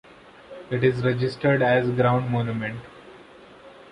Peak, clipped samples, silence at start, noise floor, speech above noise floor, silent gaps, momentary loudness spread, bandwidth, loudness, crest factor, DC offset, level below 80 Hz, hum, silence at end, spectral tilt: -6 dBFS; under 0.1%; 0.5 s; -47 dBFS; 25 dB; none; 21 LU; 9.8 kHz; -23 LUFS; 18 dB; under 0.1%; -56 dBFS; none; 0.25 s; -8.5 dB/octave